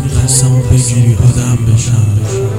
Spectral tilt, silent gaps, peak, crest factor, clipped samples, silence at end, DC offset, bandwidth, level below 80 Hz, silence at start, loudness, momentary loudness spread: -5.5 dB/octave; none; 0 dBFS; 10 dB; 0.3%; 0 s; 1%; 15 kHz; -24 dBFS; 0 s; -10 LUFS; 3 LU